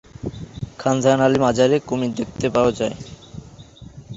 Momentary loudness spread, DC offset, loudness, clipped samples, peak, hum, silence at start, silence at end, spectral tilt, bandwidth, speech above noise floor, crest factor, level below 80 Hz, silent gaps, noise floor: 21 LU; under 0.1%; -19 LUFS; under 0.1%; -2 dBFS; none; 0.25 s; 0 s; -6 dB/octave; 8 kHz; 23 dB; 18 dB; -46 dBFS; none; -42 dBFS